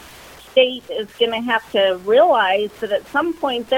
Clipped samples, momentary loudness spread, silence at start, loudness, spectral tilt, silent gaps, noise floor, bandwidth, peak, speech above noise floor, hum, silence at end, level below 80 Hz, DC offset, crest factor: under 0.1%; 9 LU; 0 s; -18 LUFS; -4 dB/octave; none; -41 dBFS; 16.5 kHz; -2 dBFS; 23 dB; none; 0 s; -56 dBFS; under 0.1%; 16 dB